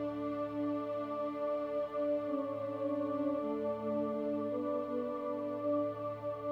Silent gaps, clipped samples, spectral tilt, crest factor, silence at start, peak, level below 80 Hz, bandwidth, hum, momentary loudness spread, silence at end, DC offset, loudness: none; under 0.1%; -8.5 dB/octave; 12 dB; 0 s; -24 dBFS; -72 dBFS; 5.6 kHz; none; 3 LU; 0 s; under 0.1%; -37 LUFS